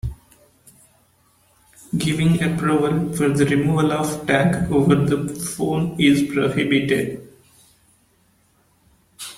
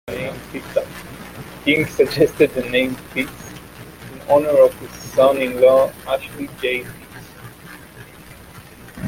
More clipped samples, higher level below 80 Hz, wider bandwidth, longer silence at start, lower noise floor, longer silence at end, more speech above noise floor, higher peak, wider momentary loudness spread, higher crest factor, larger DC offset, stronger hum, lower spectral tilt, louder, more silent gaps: neither; about the same, -46 dBFS vs -48 dBFS; about the same, 16 kHz vs 17 kHz; about the same, 0.05 s vs 0.05 s; first, -60 dBFS vs -41 dBFS; about the same, 0 s vs 0 s; first, 41 dB vs 24 dB; about the same, -2 dBFS vs -2 dBFS; second, 8 LU vs 24 LU; about the same, 20 dB vs 18 dB; neither; neither; about the same, -6 dB/octave vs -5 dB/octave; about the same, -19 LUFS vs -18 LUFS; neither